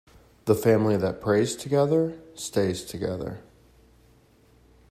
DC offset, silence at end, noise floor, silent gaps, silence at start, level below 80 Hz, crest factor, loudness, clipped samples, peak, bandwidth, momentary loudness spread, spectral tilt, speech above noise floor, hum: under 0.1%; 1.5 s; -58 dBFS; none; 0.45 s; -58 dBFS; 20 dB; -25 LUFS; under 0.1%; -6 dBFS; 15.5 kHz; 13 LU; -6 dB/octave; 34 dB; none